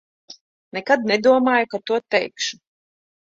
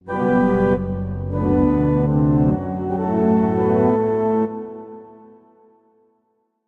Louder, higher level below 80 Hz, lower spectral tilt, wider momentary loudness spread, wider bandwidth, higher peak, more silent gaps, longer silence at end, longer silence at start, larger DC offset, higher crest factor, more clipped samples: about the same, -20 LUFS vs -19 LUFS; second, -68 dBFS vs -38 dBFS; second, -3.5 dB/octave vs -11 dB/octave; about the same, 11 LU vs 9 LU; first, 7.8 kHz vs 4.2 kHz; about the same, -4 dBFS vs -6 dBFS; first, 0.41-0.71 s vs none; second, 0.7 s vs 1.55 s; first, 0.3 s vs 0.05 s; neither; about the same, 18 dB vs 14 dB; neither